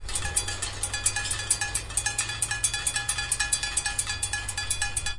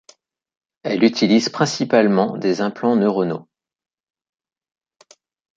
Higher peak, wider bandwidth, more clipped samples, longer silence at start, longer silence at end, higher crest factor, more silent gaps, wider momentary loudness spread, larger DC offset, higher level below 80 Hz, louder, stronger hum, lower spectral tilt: second, -6 dBFS vs -2 dBFS; first, 11.5 kHz vs 7.8 kHz; neither; second, 0 s vs 0.85 s; second, 0 s vs 2.15 s; first, 24 dB vs 18 dB; neither; second, 4 LU vs 9 LU; neither; first, -42 dBFS vs -66 dBFS; second, -26 LUFS vs -18 LUFS; neither; second, 0 dB/octave vs -5.5 dB/octave